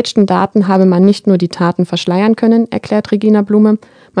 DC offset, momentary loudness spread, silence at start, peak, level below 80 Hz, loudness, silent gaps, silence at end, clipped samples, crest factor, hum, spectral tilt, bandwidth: under 0.1%; 6 LU; 0 s; 0 dBFS; -56 dBFS; -12 LUFS; none; 0 s; 0.3%; 12 dB; none; -7 dB/octave; 10 kHz